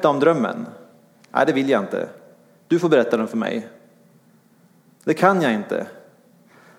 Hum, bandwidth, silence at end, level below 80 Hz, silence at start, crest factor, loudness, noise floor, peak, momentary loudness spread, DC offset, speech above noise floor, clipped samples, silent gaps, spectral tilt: none; 16 kHz; 0.8 s; -74 dBFS; 0 s; 20 dB; -20 LUFS; -55 dBFS; -2 dBFS; 15 LU; under 0.1%; 36 dB; under 0.1%; none; -6.5 dB/octave